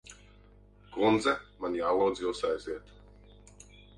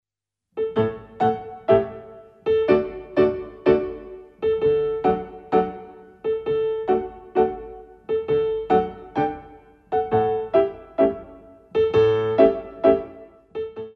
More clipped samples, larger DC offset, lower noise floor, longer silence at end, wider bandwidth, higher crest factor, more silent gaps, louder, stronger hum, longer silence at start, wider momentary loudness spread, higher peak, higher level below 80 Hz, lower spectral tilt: neither; neither; second, -57 dBFS vs -81 dBFS; first, 1.15 s vs 0.05 s; first, 11 kHz vs 5.8 kHz; about the same, 20 dB vs 20 dB; neither; second, -30 LUFS vs -22 LUFS; first, 50 Hz at -55 dBFS vs none; second, 0.1 s vs 0.55 s; about the same, 16 LU vs 14 LU; second, -14 dBFS vs -2 dBFS; second, -58 dBFS vs -50 dBFS; second, -5 dB/octave vs -8.5 dB/octave